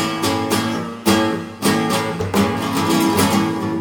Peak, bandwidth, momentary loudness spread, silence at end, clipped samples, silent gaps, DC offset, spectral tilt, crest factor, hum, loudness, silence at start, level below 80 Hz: -2 dBFS; 18 kHz; 5 LU; 0 s; under 0.1%; none; under 0.1%; -4.5 dB/octave; 16 dB; none; -18 LUFS; 0 s; -48 dBFS